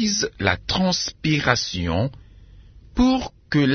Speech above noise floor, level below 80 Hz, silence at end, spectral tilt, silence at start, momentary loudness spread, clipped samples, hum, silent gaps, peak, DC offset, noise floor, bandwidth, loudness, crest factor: 25 dB; -40 dBFS; 0 s; -4.5 dB/octave; 0 s; 6 LU; under 0.1%; none; none; -2 dBFS; under 0.1%; -46 dBFS; 6.6 kHz; -22 LUFS; 20 dB